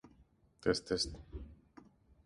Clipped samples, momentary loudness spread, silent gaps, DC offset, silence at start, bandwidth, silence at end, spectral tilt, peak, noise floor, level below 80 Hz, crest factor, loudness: under 0.1%; 17 LU; none; under 0.1%; 0.05 s; 11.5 kHz; 0.7 s; -4 dB/octave; -18 dBFS; -68 dBFS; -56 dBFS; 24 dB; -37 LUFS